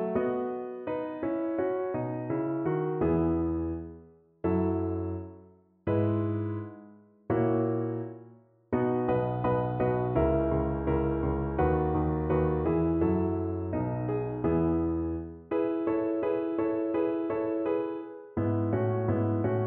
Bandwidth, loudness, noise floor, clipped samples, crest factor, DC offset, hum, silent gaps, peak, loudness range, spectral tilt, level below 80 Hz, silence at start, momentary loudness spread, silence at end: 3.7 kHz; -30 LUFS; -56 dBFS; under 0.1%; 16 dB; under 0.1%; none; none; -14 dBFS; 4 LU; -12.5 dB/octave; -44 dBFS; 0 s; 8 LU; 0 s